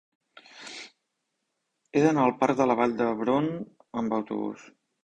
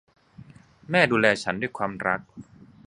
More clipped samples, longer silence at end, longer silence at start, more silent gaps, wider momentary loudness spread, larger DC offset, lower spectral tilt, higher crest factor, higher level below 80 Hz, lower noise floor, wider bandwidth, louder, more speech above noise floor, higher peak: neither; about the same, 0.4 s vs 0.45 s; first, 0.55 s vs 0.4 s; neither; first, 19 LU vs 10 LU; neither; first, -6.5 dB/octave vs -5 dB/octave; about the same, 20 dB vs 24 dB; second, -66 dBFS vs -60 dBFS; first, -80 dBFS vs -49 dBFS; second, 9.8 kHz vs 11 kHz; about the same, -26 LUFS vs -24 LUFS; first, 55 dB vs 25 dB; second, -8 dBFS vs -2 dBFS